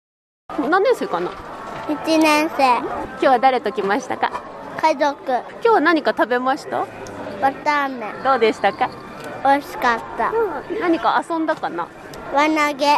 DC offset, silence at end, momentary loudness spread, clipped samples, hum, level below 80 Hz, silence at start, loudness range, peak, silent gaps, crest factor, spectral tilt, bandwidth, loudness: under 0.1%; 0 s; 13 LU; under 0.1%; none; -54 dBFS; 0.5 s; 2 LU; -4 dBFS; none; 16 dB; -4 dB/octave; 13 kHz; -19 LUFS